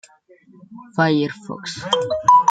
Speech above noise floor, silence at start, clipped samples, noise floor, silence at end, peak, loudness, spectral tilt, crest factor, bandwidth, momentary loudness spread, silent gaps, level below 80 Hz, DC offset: 32 dB; 0.7 s; under 0.1%; -51 dBFS; 0 s; -2 dBFS; -19 LUFS; -5 dB/octave; 18 dB; 9.2 kHz; 16 LU; none; -62 dBFS; under 0.1%